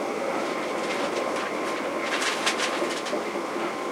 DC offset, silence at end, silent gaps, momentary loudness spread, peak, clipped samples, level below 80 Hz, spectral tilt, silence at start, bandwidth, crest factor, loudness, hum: under 0.1%; 0 s; none; 5 LU; -8 dBFS; under 0.1%; -70 dBFS; -2.5 dB/octave; 0 s; 16.5 kHz; 18 dB; -27 LUFS; none